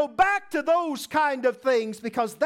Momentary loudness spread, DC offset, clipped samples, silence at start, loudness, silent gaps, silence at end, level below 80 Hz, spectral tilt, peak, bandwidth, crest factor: 6 LU; under 0.1%; under 0.1%; 0 s; -24 LUFS; none; 0 s; -60 dBFS; -3.5 dB/octave; -8 dBFS; 16.5 kHz; 16 dB